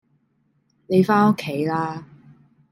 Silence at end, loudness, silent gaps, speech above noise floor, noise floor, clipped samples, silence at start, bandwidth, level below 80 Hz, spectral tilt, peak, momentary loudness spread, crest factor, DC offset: 0.65 s; -20 LUFS; none; 47 dB; -66 dBFS; under 0.1%; 0.9 s; 15.5 kHz; -66 dBFS; -7.5 dB/octave; -4 dBFS; 12 LU; 18 dB; under 0.1%